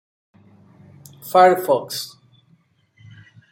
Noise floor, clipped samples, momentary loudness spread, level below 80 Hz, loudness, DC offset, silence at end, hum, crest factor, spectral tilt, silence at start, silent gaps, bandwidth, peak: -59 dBFS; under 0.1%; 20 LU; -70 dBFS; -17 LUFS; under 0.1%; 1.45 s; none; 20 dB; -4 dB/octave; 1.25 s; none; 17 kHz; -2 dBFS